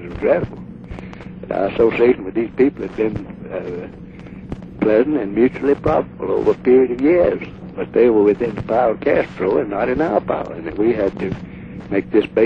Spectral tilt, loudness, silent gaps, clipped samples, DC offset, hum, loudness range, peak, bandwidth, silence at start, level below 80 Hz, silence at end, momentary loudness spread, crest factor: -9 dB/octave; -18 LUFS; none; under 0.1%; under 0.1%; none; 4 LU; -2 dBFS; 6 kHz; 0 s; -42 dBFS; 0 s; 19 LU; 16 dB